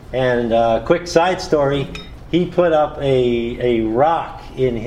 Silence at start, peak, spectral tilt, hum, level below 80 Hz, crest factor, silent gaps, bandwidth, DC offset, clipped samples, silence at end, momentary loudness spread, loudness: 0 s; 0 dBFS; -6 dB/octave; none; -38 dBFS; 18 dB; none; 11.5 kHz; under 0.1%; under 0.1%; 0 s; 6 LU; -17 LUFS